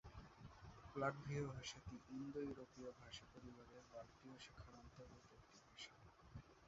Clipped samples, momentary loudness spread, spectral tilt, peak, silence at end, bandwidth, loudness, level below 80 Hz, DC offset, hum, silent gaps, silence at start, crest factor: under 0.1%; 17 LU; -5 dB/octave; -30 dBFS; 0 s; 7.6 kHz; -54 LUFS; -70 dBFS; under 0.1%; none; none; 0.05 s; 26 dB